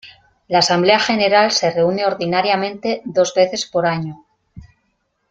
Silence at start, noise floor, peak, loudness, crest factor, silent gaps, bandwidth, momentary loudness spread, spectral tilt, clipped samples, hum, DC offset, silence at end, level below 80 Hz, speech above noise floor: 0.05 s; -68 dBFS; 0 dBFS; -16 LUFS; 18 dB; none; 9.2 kHz; 7 LU; -4 dB/octave; under 0.1%; none; under 0.1%; 0.7 s; -56 dBFS; 51 dB